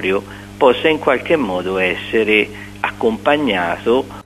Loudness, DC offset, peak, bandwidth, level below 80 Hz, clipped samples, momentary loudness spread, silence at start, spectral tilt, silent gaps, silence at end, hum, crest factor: -16 LUFS; under 0.1%; 0 dBFS; 14 kHz; -46 dBFS; under 0.1%; 9 LU; 0 s; -5.5 dB/octave; none; 0.05 s; 50 Hz at -35 dBFS; 16 dB